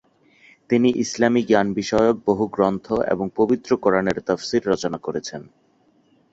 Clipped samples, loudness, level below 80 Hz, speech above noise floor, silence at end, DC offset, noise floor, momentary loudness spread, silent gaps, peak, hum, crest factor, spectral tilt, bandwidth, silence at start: under 0.1%; -21 LUFS; -52 dBFS; 40 dB; 0.9 s; under 0.1%; -60 dBFS; 8 LU; none; -2 dBFS; none; 18 dB; -5.5 dB/octave; 8 kHz; 0.7 s